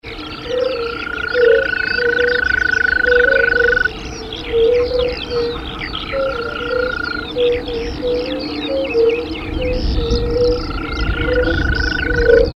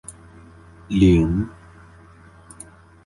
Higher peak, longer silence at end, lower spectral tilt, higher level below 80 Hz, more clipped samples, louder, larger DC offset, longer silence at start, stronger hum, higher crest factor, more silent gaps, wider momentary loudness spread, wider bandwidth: first, 0 dBFS vs -4 dBFS; second, 0.05 s vs 1.55 s; second, -5.5 dB/octave vs -7.5 dB/octave; first, -26 dBFS vs -36 dBFS; neither; about the same, -17 LUFS vs -19 LUFS; neither; about the same, 0.05 s vs 0.1 s; neither; about the same, 16 dB vs 18 dB; neither; second, 10 LU vs 26 LU; second, 6.8 kHz vs 11.5 kHz